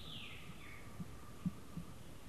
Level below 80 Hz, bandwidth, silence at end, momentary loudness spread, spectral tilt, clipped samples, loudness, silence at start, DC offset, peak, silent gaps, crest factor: -62 dBFS; 13 kHz; 0 s; 7 LU; -5 dB/octave; under 0.1%; -50 LUFS; 0 s; 0.2%; -28 dBFS; none; 22 dB